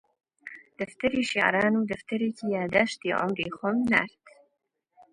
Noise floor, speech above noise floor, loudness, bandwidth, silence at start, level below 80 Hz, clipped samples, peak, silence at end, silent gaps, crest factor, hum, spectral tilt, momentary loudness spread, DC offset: -78 dBFS; 52 dB; -26 LUFS; 10.5 kHz; 0.45 s; -62 dBFS; under 0.1%; -4 dBFS; 0.85 s; none; 24 dB; none; -5 dB/octave; 15 LU; under 0.1%